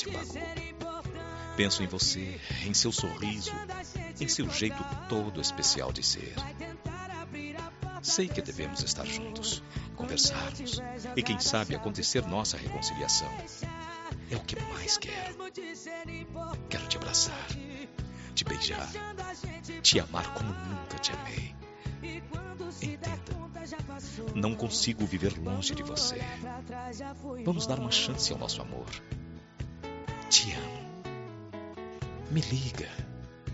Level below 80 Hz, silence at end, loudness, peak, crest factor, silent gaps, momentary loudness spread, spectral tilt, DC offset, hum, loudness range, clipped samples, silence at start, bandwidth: -50 dBFS; 0 s; -32 LUFS; -8 dBFS; 26 dB; none; 14 LU; -3 dB/octave; under 0.1%; none; 5 LU; under 0.1%; 0 s; 8 kHz